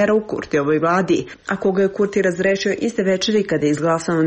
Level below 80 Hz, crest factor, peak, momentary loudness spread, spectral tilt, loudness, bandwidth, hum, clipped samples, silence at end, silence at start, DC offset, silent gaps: -52 dBFS; 12 dB; -6 dBFS; 4 LU; -5.5 dB/octave; -19 LUFS; 8.8 kHz; none; under 0.1%; 0 s; 0 s; under 0.1%; none